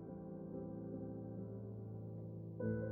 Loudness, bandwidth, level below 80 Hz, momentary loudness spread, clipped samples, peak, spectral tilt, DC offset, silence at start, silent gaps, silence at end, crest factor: -48 LUFS; 2.1 kHz; -68 dBFS; 6 LU; under 0.1%; -28 dBFS; -8.5 dB/octave; under 0.1%; 0 s; none; 0 s; 18 dB